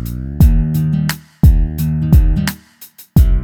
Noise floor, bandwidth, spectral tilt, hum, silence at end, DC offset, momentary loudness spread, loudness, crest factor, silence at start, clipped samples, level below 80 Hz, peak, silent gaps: -40 dBFS; 18.5 kHz; -7 dB/octave; none; 0 s; under 0.1%; 9 LU; -15 LUFS; 12 dB; 0 s; under 0.1%; -16 dBFS; 0 dBFS; none